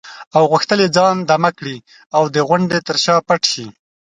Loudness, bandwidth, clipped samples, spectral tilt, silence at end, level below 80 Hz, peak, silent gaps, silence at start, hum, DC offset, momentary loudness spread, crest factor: -15 LUFS; 11 kHz; under 0.1%; -4.5 dB/octave; 0.4 s; -60 dBFS; 0 dBFS; 0.27-0.31 s, 2.06-2.10 s; 0.05 s; none; under 0.1%; 13 LU; 16 dB